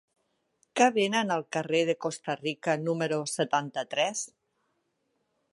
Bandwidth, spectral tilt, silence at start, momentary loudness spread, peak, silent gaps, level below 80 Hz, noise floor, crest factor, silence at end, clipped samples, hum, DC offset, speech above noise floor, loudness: 11.5 kHz; -3.5 dB/octave; 0.75 s; 8 LU; -10 dBFS; none; -82 dBFS; -77 dBFS; 20 dB; 1.25 s; under 0.1%; none; under 0.1%; 48 dB; -28 LUFS